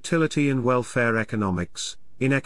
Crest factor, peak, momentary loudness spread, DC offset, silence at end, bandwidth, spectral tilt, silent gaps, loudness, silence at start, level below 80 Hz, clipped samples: 14 dB; -10 dBFS; 9 LU; 0.8%; 0.05 s; 12 kHz; -5.5 dB/octave; none; -24 LUFS; 0.05 s; -56 dBFS; under 0.1%